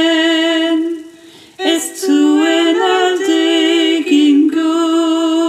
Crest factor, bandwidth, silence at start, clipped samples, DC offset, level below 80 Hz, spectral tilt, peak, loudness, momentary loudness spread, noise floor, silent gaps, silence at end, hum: 12 dB; 15.5 kHz; 0 s; under 0.1%; under 0.1%; -72 dBFS; -1.5 dB/octave; 0 dBFS; -13 LUFS; 6 LU; -40 dBFS; none; 0 s; none